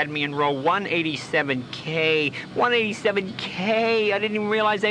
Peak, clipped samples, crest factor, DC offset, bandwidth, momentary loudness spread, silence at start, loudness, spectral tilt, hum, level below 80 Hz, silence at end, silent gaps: -8 dBFS; under 0.1%; 16 dB; under 0.1%; 10.5 kHz; 6 LU; 0 s; -23 LUFS; -5 dB/octave; none; -64 dBFS; 0 s; none